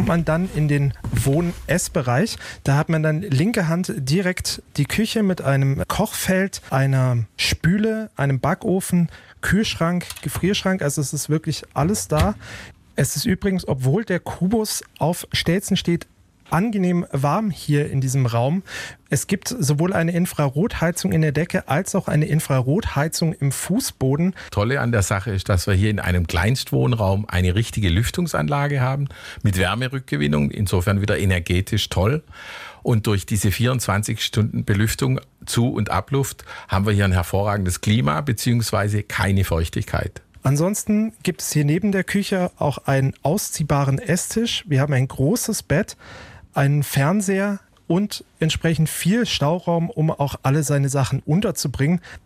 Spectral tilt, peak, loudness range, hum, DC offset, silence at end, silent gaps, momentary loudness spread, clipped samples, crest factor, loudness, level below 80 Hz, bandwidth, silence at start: -5.5 dB/octave; -6 dBFS; 2 LU; none; under 0.1%; 0.1 s; none; 5 LU; under 0.1%; 14 dB; -21 LUFS; -40 dBFS; 16 kHz; 0 s